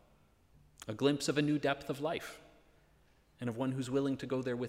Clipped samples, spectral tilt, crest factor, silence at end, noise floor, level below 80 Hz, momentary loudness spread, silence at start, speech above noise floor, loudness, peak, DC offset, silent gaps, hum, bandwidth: under 0.1%; -5.5 dB/octave; 18 dB; 0 s; -67 dBFS; -68 dBFS; 14 LU; 0.8 s; 33 dB; -35 LUFS; -18 dBFS; under 0.1%; none; none; 16 kHz